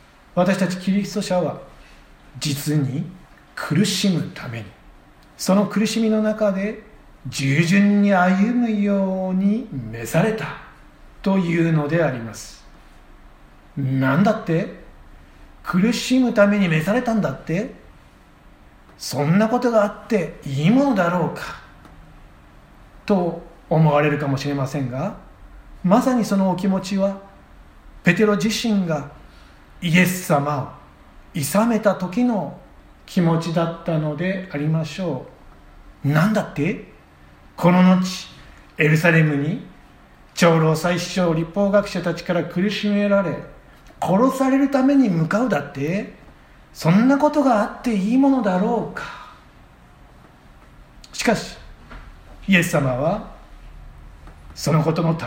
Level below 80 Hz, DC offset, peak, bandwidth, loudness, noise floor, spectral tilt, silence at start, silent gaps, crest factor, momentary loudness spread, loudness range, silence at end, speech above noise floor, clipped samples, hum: -48 dBFS; under 0.1%; 0 dBFS; 16.5 kHz; -20 LUFS; -48 dBFS; -6 dB/octave; 0.35 s; none; 20 dB; 15 LU; 5 LU; 0 s; 29 dB; under 0.1%; none